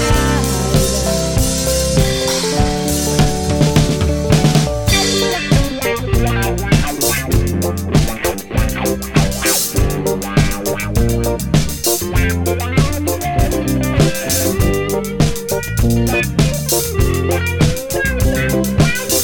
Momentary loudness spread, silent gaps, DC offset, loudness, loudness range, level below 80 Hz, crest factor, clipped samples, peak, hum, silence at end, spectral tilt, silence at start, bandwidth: 4 LU; none; under 0.1%; -15 LUFS; 2 LU; -22 dBFS; 14 dB; under 0.1%; 0 dBFS; none; 0 s; -4.5 dB/octave; 0 s; 17.5 kHz